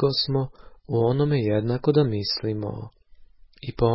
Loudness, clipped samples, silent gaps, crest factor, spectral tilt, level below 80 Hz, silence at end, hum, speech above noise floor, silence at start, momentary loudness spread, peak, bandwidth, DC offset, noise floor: -24 LUFS; under 0.1%; none; 16 dB; -10.5 dB/octave; -48 dBFS; 0 s; none; 26 dB; 0 s; 16 LU; -8 dBFS; 5.8 kHz; under 0.1%; -49 dBFS